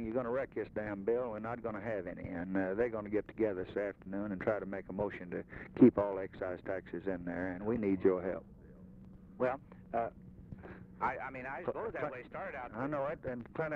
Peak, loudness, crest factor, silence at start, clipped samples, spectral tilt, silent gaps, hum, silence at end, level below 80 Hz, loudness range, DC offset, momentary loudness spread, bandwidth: -14 dBFS; -37 LUFS; 24 dB; 0 s; under 0.1%; -10 dB/octave; none; none; 0 s; -62 dBFS; 7 LU; under 0.1%; 14 LU; 4.8 kHz